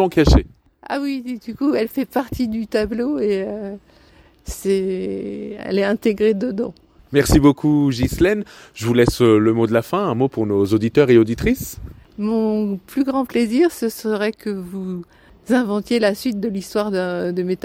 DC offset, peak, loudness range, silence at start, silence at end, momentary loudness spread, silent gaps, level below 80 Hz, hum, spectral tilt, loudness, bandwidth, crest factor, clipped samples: under 0.1%; -2 dBFS; 6 LU; 0 s; 0.1 s; 14 LU; none; -32 dBFS; none; -6.5 dB/octave; -19 LUFS; 17 kHz; 18 dB; under 0.1%